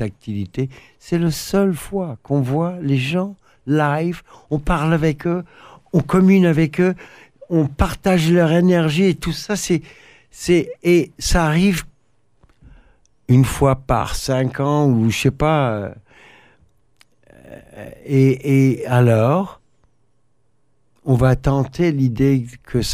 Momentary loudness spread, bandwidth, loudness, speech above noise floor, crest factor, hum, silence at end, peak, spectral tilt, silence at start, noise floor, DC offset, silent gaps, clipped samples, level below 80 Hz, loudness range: 11 LU; 15.5 kHz; -18 LUFS; 49 dB; 16 dB; none; 0 s; -4 dBFS; -6.5 dB/octave; 0 s; -66 dBFS; under 0.1%; none; under 0.1%; -34 dBFS; 4 LU